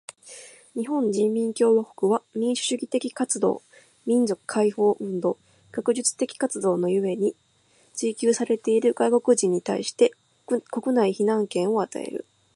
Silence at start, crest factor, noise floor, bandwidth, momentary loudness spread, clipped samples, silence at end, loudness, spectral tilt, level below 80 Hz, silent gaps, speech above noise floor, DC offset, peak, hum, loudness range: 0.25 s; 18 dB; -61 dBFS; 11.5 kHz; 12 LU; under 0.1%; 0.35 s; -24 LUFS; -4.5 dB/octave; -76 dBFS; none; 38 dB; under 0.1%; -6 dBFS; none; 3 LU